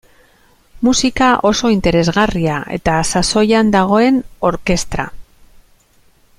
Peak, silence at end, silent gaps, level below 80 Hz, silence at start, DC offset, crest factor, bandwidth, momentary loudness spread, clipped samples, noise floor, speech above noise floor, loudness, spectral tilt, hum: 0 dBFS; 1.15 s; none; -34 dBFS; 0.75 s; under 0.1%; 14 dB; 15 kHz; 7 LU; under 0.1%; -52 dBFS; 38 dB; -14 LUFS; -4.5 dB/octave; none